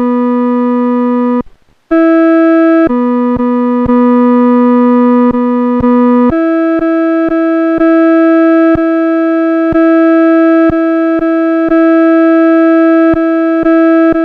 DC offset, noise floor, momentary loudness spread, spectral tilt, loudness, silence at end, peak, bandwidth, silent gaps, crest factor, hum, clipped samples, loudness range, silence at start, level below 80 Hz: under 0.1%; -37 dBFS; 4 LU; -9 dB/octave; -8 LUFS; 0 s; 0 dBFS; 4.4 kHz; none; 8 dB; none; under 0.1%; 2 LU; 0 s; -38 dBFS